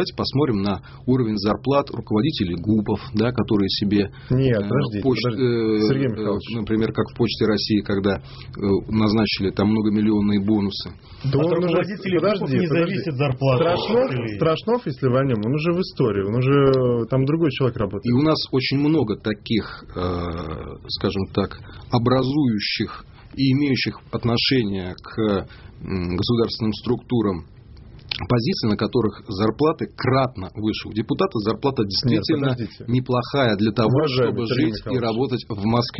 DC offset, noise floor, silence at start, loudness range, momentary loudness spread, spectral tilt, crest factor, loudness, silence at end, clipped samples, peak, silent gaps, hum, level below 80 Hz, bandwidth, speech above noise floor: under 0.1%; -42 dBFS; 0 s; 3 LU; 7 LU; -5.5 dB/octave; 18 dB; -21 LUFS; 0 s; under 0.1%; -2 dBFS; none; none; -46 dBFS; 6 kHz; 22 dB